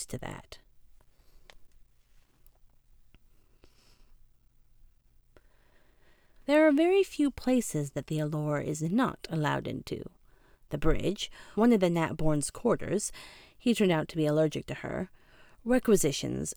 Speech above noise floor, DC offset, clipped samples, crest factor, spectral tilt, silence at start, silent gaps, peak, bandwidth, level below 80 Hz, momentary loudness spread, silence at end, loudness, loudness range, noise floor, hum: 33 dB; under 0.1%; under 0.1%; 20 dB; -5.5 dB/octave; 0 s; none; -12 dBFS; over 20 kHz; -46 dBFS; 16 LU; 0.05 s; -29 LUFS; 4 LU; -62 dBFS; none